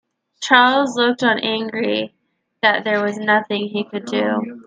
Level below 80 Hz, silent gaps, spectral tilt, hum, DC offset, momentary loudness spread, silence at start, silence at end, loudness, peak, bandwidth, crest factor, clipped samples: -70 dBFS; none; -4 dB/octave; none; under 0.1%; 11 LU; 0.4 s; 0.05 s; -18 LUFS; 0 dBFS; 9.4 kHz; 18 dB; under 0.1%